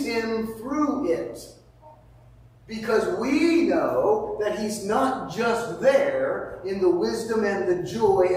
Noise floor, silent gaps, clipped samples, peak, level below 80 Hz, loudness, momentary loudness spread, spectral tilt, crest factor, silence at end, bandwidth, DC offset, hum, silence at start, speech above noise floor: -51 dBFS; none; under 0.1%; -8 dBFS; -54 dBFS; -24 LUFS; 9 LU; -5.5 dB/octave; 16 dB; 0 s; 16 kHz; under 0.1%; none; 0 s; 28 dB